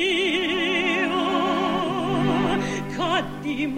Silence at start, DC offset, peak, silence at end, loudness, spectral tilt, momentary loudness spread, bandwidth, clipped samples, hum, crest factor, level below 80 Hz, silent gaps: 0 s; under 0.1%; -10 dBFS; 0 s; -23 LUFS; -5 dB/octave; 5 LU; 16 kHz; under 0.1%; none; 12 dB; -48 dBFS; none